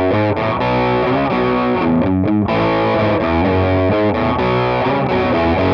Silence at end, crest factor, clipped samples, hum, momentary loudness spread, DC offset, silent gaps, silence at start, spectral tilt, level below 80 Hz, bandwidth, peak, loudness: 0 s; 10 dB; under 0.1%; none; 1 LU; under 0.1%; none; 0 s; -8.5 dB/octave; -36 dBFS; 6.6 kHz; -4 dBFS; -15 LUFS